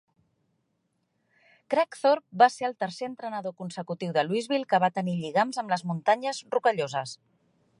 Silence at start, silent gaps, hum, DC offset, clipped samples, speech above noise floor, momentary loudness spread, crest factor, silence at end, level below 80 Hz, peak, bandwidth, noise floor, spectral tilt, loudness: 1.7 s; none; none; under 0.1%; under 0.1%; 49 dB; 13 LU; 22 dB; 0.65 s; -80 dBFS; -6 dBFS; 11.5 kHz; -76 dBFS; -5 dB/octave; -27 LUFS